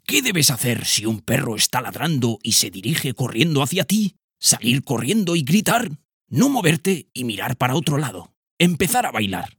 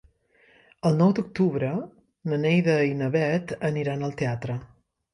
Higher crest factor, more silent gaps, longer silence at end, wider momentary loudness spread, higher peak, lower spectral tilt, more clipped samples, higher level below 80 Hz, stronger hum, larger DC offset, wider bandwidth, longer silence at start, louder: about the same, 20 dB vs 18 dB; first, 4.24-4.28 s, 6.05-6.20 s, 8.37-8.43 s, 8.51-8.57 s vs none; second, 0.1 s vs 0.5 s; second, 8 LU vs 12 LU; first, 0 dBFS vs -8 dBFS; second, -3.5 dB/octave vs -8 dB/octave; neither; about the same, -56 dBFS vs -60 dBFS; neither; neither; first, 19 kHz vs 11 kHz; second, 0.1 s vs 0.85 s; first, -19 LUFS vs -25 LUFS